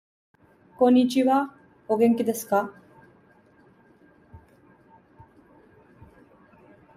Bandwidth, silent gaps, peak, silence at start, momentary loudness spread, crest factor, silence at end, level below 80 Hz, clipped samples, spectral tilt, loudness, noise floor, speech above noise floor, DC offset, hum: 15.5 kHz; none; -8 dBFS; 0.8 s; 10 LU; 20 dB; 2.6 s; -68 dBFS; under 0.1%; -5.5 dB/octave; -23 LUFS; -57 dBFS; 36 dB; under 0.1%; none